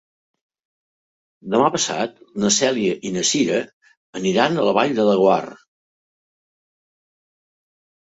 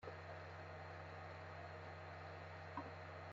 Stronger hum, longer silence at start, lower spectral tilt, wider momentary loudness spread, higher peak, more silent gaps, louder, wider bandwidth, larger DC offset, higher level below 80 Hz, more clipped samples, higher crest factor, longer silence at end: neither; first, 1.45 s vs 0 s; about the same, -3.5 dB/octave vs -4.5 dB/octave; first, 10 LU vs 2 LU; first, -2 dBFS vs -36 dBFS; first, 3.73-3.81 s, 3.97-4.13 s vs none; first, -19 LUFS vs -53 LUFS; first, 8.2 kHz vs 7.4 kHz; neither; first, -64 dBFS vs -80 dBFS; neither; about the same, 20 dB vs 18 dB; first, 2.55 s vs 0 s